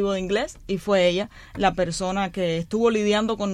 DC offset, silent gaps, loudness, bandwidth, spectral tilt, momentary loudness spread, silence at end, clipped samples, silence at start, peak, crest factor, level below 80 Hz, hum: under 0.1%; none; -23 LUFS; 13.5 kHz; -5 dB/octave; 8 LU; 0 s; under 0.1%; 0 s; -8 dBFS; 16 dB; -46 dBFS; none